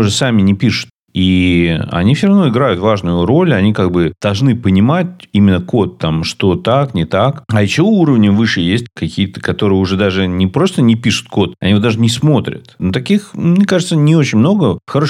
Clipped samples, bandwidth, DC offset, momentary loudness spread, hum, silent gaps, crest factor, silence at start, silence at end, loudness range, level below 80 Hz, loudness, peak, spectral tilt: under 0.1%; 12 kHz; under 0.1%; 6 LU; none; 0.90-1.06 s; 12 dB; 0 s; 0 s; 1 LU; -40 dBFS; -13 LUFS; 0 dBFS; -6.5 dB/octave